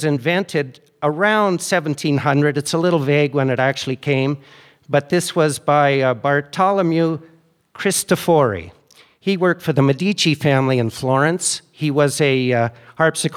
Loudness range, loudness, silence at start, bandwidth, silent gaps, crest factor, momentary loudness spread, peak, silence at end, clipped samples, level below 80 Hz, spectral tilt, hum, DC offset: 2 LU; -18 LUFS; 0 s; 16 kHz; none; 16 dB; 7 LU; -2 dBFS; 0 s; under 0.1%; -62 dBFS; -5 dB/octave; none; under 0.1%